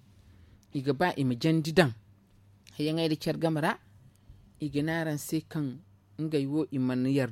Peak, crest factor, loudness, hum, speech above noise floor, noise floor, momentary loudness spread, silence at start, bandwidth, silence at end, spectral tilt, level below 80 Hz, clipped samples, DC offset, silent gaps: -8 dBFS; 22 dB; -30 LUFS; none; 31 dB; -60 dBFS; 13 LU; 0.75 s; 16.5 kHz; 0 s; -6.5 dB/octave; -62 dBFS; under 0.1%; under 0.1%; none